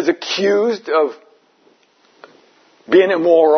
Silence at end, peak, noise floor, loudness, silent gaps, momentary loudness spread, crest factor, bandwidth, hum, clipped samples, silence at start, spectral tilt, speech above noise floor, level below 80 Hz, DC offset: 0 s; -2 dBFS; -55 dBFS; -15 LUFS; none; 5 LU; 16 dB; 6.6 kHz; none; under 0.1%; 0 s; -4.5 dB/octave; 41 dB; -72 dBFS; under 0.1%